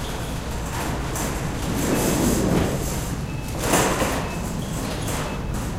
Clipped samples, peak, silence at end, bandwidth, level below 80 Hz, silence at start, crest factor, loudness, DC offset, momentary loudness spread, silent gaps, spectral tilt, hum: under 0.1%; -6 dBFS; 0 s; 16.5 kHz; -32 dBFS; 0 s; 18 dB; -24 LUFS; under 0.1%; 9 LU; none; -4.5 dB/octave; none